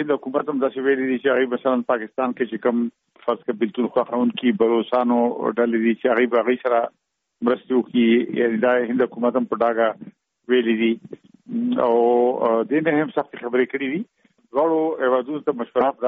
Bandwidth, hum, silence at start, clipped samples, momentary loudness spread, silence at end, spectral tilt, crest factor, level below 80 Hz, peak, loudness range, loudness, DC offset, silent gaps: 3.9 kHz; none; 0 s; under 0.1%; 7 LU; 0 s; -4 dB/octave; 14 dB; -68 dBFS; -6 dBFS; 2 LU; -21 LUFS; under 0.1%; none